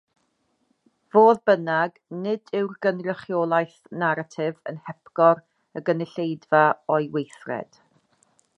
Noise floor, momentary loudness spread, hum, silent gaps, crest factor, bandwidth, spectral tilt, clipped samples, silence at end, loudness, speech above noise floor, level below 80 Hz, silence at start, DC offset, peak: -70 dBFS; 15 LU; none; none; 20 dB; 9.6 kHz; -7.5 dB/octave; under 0.1%; 0.95 s; -23 LUFS; 48 dB; -78 dBFS; 1.15 s; under 0.1%; -4 dBFS